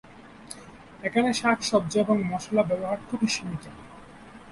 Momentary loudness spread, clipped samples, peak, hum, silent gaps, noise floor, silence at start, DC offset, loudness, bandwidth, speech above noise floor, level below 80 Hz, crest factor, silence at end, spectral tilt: 23 LU; under 0.1%; -10 dBFS; none; none; -47 dBFS; 0.05 s; under 0.1%; -26 LUFS; 11.5 kHz; 21 dB; -58 dBFS; 18 dB; 0 s; -4.5 dB/octave